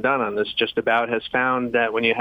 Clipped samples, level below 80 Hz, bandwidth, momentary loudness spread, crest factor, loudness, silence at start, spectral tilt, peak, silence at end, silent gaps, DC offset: under 0.1%; -58 dBFS; 5.2 kHz; 2 LU; 16 dB; -21 LUFS; 0 s; -6.5 dB/octave; -6 dBFS; 0 s; none; under 0.1%